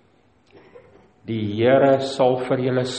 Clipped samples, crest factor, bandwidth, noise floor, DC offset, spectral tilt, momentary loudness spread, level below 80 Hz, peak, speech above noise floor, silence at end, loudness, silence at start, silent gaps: under 0.1%; 18 dB; 8.8 kHz; -58 dBFS; under 0.1%; -6.5 dB/octave; 11 LU; -62 dBFS; -4 dBFS; 40 dB; 0 s; -20 LUFS; 1.25 s; none